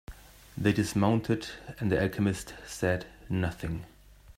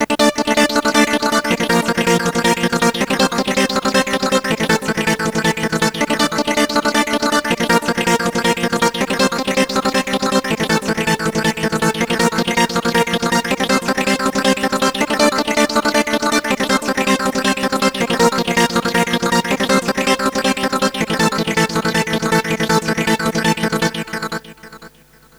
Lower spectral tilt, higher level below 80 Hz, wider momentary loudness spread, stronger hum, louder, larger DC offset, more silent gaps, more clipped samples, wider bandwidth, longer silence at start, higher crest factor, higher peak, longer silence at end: first, -6 dB/octave vs -3.5 dB/octave; second, -50 dBFS vs -44 dBFS; first, 14 LU vs 3 LU; neither; second, -30 LUFS vs -16 LUFS; second, under 0.1% vs 0.2%; neither; neither; second, 16 kHz vs over 20 kHz; about the same, 0.1 s vs 0 s; about the same, 20 dB vs 16 dB; second, -10 dBFS vs 0 dBFS; second, 0.05 s vs 0.5 s